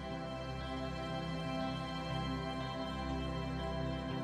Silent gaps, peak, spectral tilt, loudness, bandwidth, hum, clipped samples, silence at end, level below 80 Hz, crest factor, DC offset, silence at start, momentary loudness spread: none; -26 dBFS; -6.5 dB/octave; -40 LUFS; 12 kHz; none; under 0.1%; 0 s; -48 dBFS; 12 dB; under 0.1%; 0 s; 3 LU